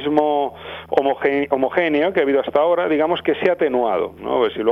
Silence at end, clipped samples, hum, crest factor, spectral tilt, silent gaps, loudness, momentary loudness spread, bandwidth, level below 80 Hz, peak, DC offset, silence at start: 0 s; under 0.1%; none; 16 dB; -7 dB/octave; none; -19 LUFS; 5 LU; 12 kHz; -54 dBFS; -2 dBFS; under 0.1%; 0 s